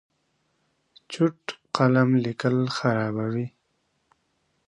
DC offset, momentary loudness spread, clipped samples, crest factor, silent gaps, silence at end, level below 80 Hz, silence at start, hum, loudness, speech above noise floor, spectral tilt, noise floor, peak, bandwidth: under 0.1%; 13 LU; under 0.1%; 22 dB; none; 1.2 s; -68 dBFS; 1.1 s; none; -24 LUFS; 49 dB; -7 dB/octave; -72 dBFS; -6 dBFS; 10 kHz